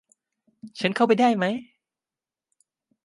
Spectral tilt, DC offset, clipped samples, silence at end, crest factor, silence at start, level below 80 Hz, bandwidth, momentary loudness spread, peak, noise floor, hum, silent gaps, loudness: -6 dB/octave; under 0.1%; under 0.1%; 1.4 s; 20 dB; 0.65 s; -76 dBFS; 11.5 kHz; 14 LU; -6 dBFS; under -90 dBFS; none; none; -23 LUFS